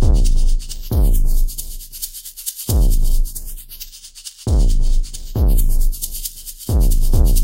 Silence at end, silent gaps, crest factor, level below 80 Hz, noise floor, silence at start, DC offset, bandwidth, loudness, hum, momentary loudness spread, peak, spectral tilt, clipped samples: 0 s; none; 12 dB; -14 dBFS; -37 dBFS; 0 s; under 0.1%; 16 kHz; -21 LUFS; none; 14 LU; -2 dBFS; -5.5 dB/octave; under 0.1%